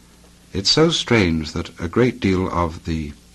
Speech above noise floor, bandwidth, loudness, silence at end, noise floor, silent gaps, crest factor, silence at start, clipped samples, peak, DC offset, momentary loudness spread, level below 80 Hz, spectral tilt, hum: 29 dB; 12.5 kHz; -19 LUFS; 0.2 s; -48 dBFS; none; 16 dB; 0.55 s; under 0.1%; -4 dBFS; under 0.1%; 12 LU; -38 dBFS; -5 dB/octave; none